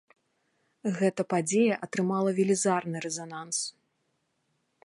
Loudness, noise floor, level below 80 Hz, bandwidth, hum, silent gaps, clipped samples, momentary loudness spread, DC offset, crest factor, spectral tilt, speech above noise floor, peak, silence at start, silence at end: -28 LUFS; -76 dBFS; -78 dBFS; 11.5 kHz; none; none; under 0.1%; 10 LU; under 0.1%; 18 dB; -4.5 dB/octave; 48 dB; -12 dBFS; 0.85 s; 1.15 s